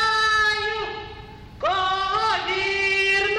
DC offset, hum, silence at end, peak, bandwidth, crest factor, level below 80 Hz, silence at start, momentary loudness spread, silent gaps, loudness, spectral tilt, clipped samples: under 0.1%; none; 0 s; -10 dBFS; 12.5 kHz; 12 dB; -46 dBFS; 0 s; 14 LU; none; -21 LUFS; -2 dB/octave; under 0.1%